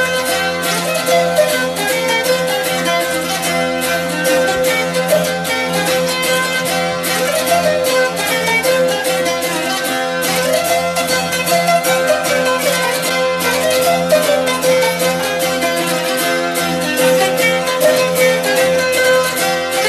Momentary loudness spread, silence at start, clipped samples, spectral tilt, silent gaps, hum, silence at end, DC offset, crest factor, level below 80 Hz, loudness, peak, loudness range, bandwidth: 4 LU; 0 s; under 0.1%; -2.5 dB/octave; none; none; 0 s; under 0.1%; 14 dB; -52 dBFS; -14 LUFS; 0 dBFS; 1 LU; 15 kHz